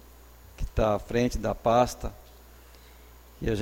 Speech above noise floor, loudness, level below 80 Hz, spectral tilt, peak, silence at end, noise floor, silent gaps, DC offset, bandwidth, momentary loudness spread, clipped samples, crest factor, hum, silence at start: 25 dB; -27 LUFS; -40 dBFS; -6 dB/octave; -8 dBFS; 0 s; -51 dBFS; none; under 0.1%; 16.5 kHz; 16 LU; under 0.1%; 20 dB; none; 0.6 s